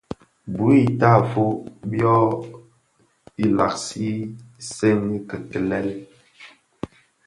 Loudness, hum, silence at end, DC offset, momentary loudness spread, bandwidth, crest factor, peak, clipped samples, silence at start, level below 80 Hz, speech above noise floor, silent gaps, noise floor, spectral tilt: -21 LUFS; none; 0.4 s; under 0.1%; 20 LU; 11.5 kHz; 20 dB; -2 dBFS; under 0.1%; 0.45 s; -54 dBFS; 43 dB; none; -63 dBFS; -7 dB/octave